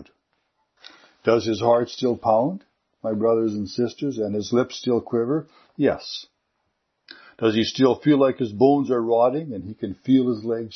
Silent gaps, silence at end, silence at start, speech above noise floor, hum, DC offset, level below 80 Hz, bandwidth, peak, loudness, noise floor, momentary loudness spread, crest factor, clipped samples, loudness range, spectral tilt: none; 0 s; 0 s; 53 dB; none; under 0.1%; -64 dBFS; 6.4 kHz; -4 dBFS; -22 LUFS; -74 dBFS; 12 LU; 18 dB; under 0.1%; 5 LU; -6.5 dB/octave